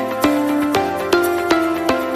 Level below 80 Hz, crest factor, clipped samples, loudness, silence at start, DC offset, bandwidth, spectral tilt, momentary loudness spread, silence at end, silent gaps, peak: -48 dBFS; 16 dB; under 0.1%; -17 LUFS; 0 s; under 0.1%; 15.5 kHz; -4.5 dB/octave; 2 LU; 0 s; none; -2 dBFS